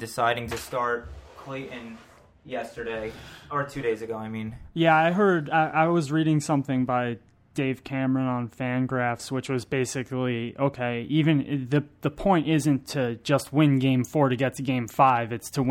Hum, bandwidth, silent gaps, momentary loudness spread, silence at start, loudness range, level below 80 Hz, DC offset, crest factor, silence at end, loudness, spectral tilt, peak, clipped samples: none; 16.5 kHz; none; 14 LU; 0 s; 10 LU; -54 dBFS; under 0.1%; 18 dB; 0 s; -25 LUFS; -6.5 dB/octave; -8 dBFS; under 0.1%